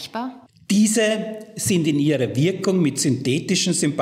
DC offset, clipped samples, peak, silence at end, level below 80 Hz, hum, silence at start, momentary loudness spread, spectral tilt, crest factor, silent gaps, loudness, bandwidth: under 0.1%; under 0.1%; -8 dBFS; 0 s; -68 dBFS; none; 0 s; 10 LU; -4.5 dB/octave; 12 dB; none; -20 LUFS; 16 kHz